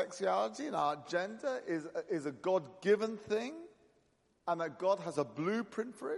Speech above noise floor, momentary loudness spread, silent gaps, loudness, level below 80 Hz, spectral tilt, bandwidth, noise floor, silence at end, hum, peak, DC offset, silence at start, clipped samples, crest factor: 38 dB; 7 LU; none; -36 LUFS; -82 dBFS; -5.5 dB/octave; 11.5 kHz; -74 dBFS; 0 s; none; -18 dBFS; under 0.1%; 0 s; under 0.1%; 18 dB